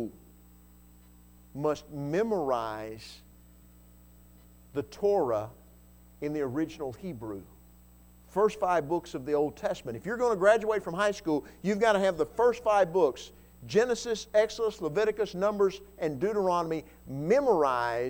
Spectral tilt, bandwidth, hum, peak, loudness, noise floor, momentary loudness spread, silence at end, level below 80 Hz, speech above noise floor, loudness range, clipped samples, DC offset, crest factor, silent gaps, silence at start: -5.5 dB/octave; 19 kHz; 60 Hz at -55 dBFS; -10 dBFS; -29 LUFS; -56 dBFS; 14 LU; 0 s; -58 dBFS; 27 dB; 7 LU; under 0.1%; under 0.1%; 20 dB; none; 0 s